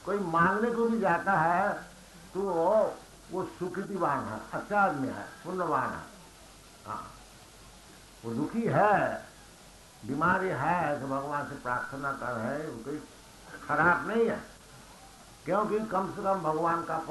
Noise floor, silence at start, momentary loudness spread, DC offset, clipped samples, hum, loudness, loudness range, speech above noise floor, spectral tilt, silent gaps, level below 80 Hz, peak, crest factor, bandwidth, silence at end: -53 dBFS; 0 s; 22 LU; under 0.1%; under 0.1%; none; -30 LUFS; 4 LU; 24 dB; -6.5 dB/octave; none; -60 dBFS; -12 dBFS; 18 dB; 12 kHz; 0 s